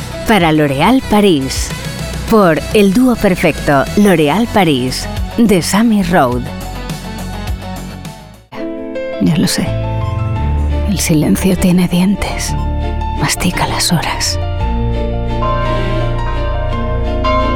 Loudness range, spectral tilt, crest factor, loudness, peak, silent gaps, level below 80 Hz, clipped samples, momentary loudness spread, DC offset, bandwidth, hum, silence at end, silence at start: 7 LU; -5.5 dB/octave; 12 dB; -14 LUFS; 0 dBFS; none; -22 dBFS; under 0.1%; 13 LU; under 0.1%; 18 kHz; none; 0 s; 0 s